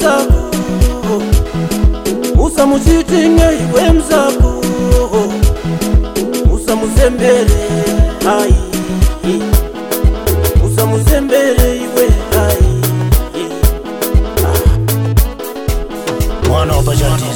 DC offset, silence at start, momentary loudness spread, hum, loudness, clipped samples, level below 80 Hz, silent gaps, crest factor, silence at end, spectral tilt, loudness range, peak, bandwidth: 0.2%; 0 s; 6 LU; none; -13 LUFS; under 0.1%; -14 dBFS; none; 10 dB; 0 s; -6 dB/octave; 3 LU; 0 dBFS; 18 kHz